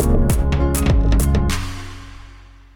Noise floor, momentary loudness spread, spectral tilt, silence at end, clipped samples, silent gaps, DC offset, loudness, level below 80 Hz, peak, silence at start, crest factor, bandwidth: -42 dBFS; 19 LU; -6 dB/octave; 0.4 s; under 0.1%; none; under 0.1%; -18 LUFS; -20 dBFS; -6 dBFS; 0 s; 12 dB; 19.5 kHz